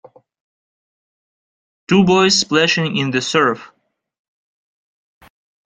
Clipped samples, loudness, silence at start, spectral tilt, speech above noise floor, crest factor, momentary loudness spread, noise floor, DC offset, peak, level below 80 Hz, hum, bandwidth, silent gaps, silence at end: under 0.1%; -15 LUFS; 1.9 s; -4 dB/octave; over 75 dB; 18 dB; 7 LU; under -90 dBFS; under 0.1%; -2 dBFS; -56 dBFS; none; 9.4 kHz; none; 2 s